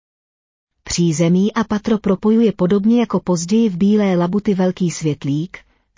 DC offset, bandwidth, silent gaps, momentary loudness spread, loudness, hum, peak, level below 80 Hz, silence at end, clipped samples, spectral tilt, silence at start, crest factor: under 0.1%; 7.6 kHz; none; 7 LU; -17 LUFS; none; -4 dBFS; -48 dBFS; 0.4 s; under 0.1%; -6.5 dB/octave; 0.85 s; 12 dB